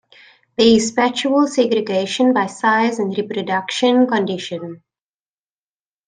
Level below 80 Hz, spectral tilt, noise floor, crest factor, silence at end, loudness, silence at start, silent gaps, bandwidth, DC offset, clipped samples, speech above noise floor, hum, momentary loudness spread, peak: -58 dBFS; -4 dB/octave; under -90 dBFS; 16 dB; 1.3 s; -17 LUFS; 0.6 s; none; 9.6 kHz; under 0.1%; under 0.1%; over 73 dB; none; 11 LU; -2 dBFS